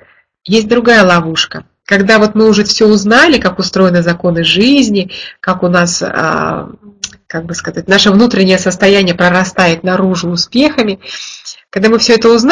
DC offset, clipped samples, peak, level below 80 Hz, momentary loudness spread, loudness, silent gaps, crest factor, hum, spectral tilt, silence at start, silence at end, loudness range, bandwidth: under 0.1%; 0.3%; 0 dBFS; -42 dBFS; 15 LU; -9 LUFS; none; 10 dB; none; -4.5 dB/octave; 0.45 s; 0 s; 4 LU; 10.5 kHz